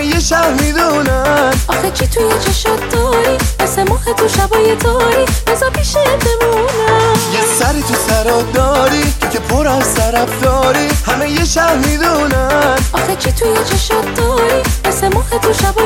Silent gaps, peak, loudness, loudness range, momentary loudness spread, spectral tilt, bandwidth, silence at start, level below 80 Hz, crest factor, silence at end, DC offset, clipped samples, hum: none; 0 dBFS; -12 LUFS; 1 LU; 3 LU; -4 dB/octave; 17 kHz; 0 s; -22 dBFS; 12 dB; 0 s; under 0.1%; under 0.1%; none